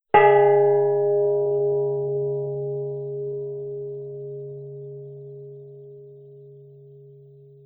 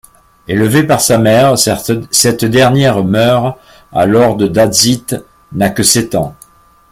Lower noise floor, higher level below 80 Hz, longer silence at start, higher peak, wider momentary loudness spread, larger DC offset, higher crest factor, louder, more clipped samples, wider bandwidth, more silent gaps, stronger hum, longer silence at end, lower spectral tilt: first, -48 dBFS vs -43 dBFS; second, -64 dBFS vs -42 dBFS; second, 0.15 s vs 0.5 s; second, -4 dBFS vs 0 dBFS; first, 24 LU vs 10 LU; neither; first, 20 dB vs 12 dB; second, -22 LUFS vs -10 LUFS; neither; second, 3.5 kHz vs over 20 kHz; neither; neither; about the same, 0.55 s vs 0.6 s; first, -11 dB/octave vs -4 dB/octave